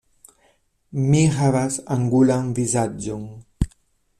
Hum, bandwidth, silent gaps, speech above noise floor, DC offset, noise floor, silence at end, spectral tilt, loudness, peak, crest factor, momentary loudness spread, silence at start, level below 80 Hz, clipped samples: none; 13 kHz; none; 43 dB; under 0.1%; -62 dBFS; 0.5 s; -6.5 dB/octave; -21 LUFS; -4 dBFS; 18 dB; 13 LU; 0.95 s; -38 dBFS; under 0.1%